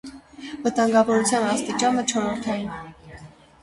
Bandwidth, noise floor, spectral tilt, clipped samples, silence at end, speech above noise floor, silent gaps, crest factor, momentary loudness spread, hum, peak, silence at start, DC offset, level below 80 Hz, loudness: 11.5 kHz; -45 dBFS; -3.5 dB/octave; under 0.1%; 0.35 s; 23 dB; none; 18 dB; 20 LU; none; -6 dBFS; 0.05 s; under 0.1%; -56 dBFS; -22 LUFS